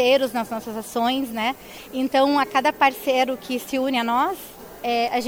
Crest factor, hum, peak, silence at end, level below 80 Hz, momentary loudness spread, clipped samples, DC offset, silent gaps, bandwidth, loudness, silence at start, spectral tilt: 18 dB; none; -4 dBFS; 0 s; -58 dBFS; 11 LU; under 0.1%; under 0.1%; none; 17.5 kHz; -22 LUFS; 0 s; -3 dB/octave